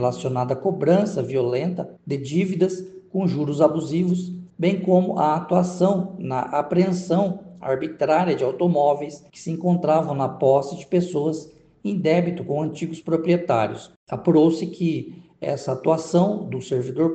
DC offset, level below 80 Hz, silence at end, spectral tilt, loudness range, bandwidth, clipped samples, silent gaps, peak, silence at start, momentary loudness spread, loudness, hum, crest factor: under 0.1%; -62 dBFS; 0 s; -7.5 dB/octave; 2 LU; 8.6 kHz; under 0.1%; 13.96-14.07 s; -4 dBFS; 0 s; 10 LU; -22 LUFS; none; 18 dB